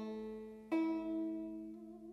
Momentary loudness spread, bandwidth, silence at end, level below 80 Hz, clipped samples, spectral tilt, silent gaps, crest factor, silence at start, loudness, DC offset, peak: 13 LU; 6 kHz; 0 s; -72 dBFS; under 0.1%; -7.5 dB/octave; none; 16 dB; 0 s; -42 LUFS; under 0.1%; -26 dBFS